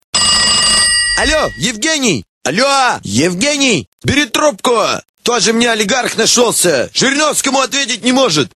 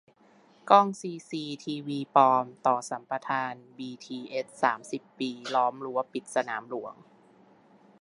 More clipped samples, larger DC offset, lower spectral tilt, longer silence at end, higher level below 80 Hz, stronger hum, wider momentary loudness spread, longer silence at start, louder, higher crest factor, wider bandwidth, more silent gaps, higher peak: neither; first, 0.1% vs under 0.1%; second, -2 dB/octave vs -4.5 dB/octave; second, 0.1 s vs 1.1 s; first, -38 dBFS vs -84 dBFS; neither; second, 7 LU vs 17 LU; second, 0.15 s vs 0.65 s; first, -11 LUFS vs -28 LUFS; second, 12 dB vs 24 dB; first, 15.5 kHz vs 11.5 kHz; first, 2.29-2.41 s, 3.87-3.98 s, 5.09-5.14 s vs none; first, 0 dBFS vs -4 dBFS